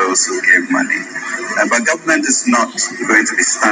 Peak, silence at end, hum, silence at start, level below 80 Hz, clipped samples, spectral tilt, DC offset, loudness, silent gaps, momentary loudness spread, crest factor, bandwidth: 0 dBFS; 0 s; none; 0 s; -72 dBFS; under 0.1%; -1 dB/octave; under 0.1%; -13 LUFS; none; 8 LU; 14 dB; 10.5 kHz